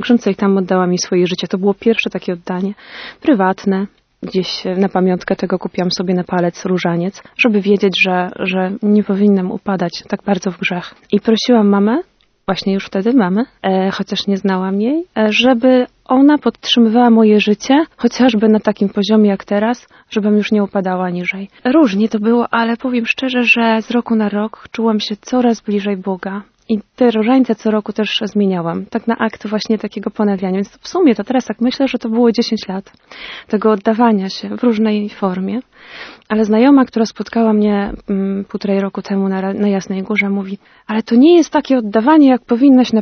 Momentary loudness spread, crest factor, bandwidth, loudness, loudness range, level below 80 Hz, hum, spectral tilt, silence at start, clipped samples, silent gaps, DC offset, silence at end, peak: 10 LU; 14 dB; 6.6 kHz; -15 LUFS; 5 LU; -52 dBFS; none; -6 dB/octave; 0 s; under 0.1%; none; under 0.1%; 0 s; 0 dBFS